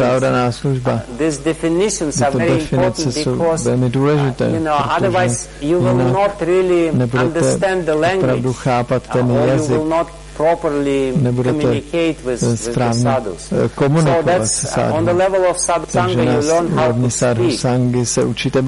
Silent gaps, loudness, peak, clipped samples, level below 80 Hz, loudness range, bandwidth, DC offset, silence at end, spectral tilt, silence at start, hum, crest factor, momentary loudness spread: none; -16 LUFS; -6 dBFS; under 0.1%; -38 dBFS; 2 LU; 11.5 kHz; under 0.1%; 0 s; -5.5 dB/octave; 0 s; none; 10 dB; 4 LU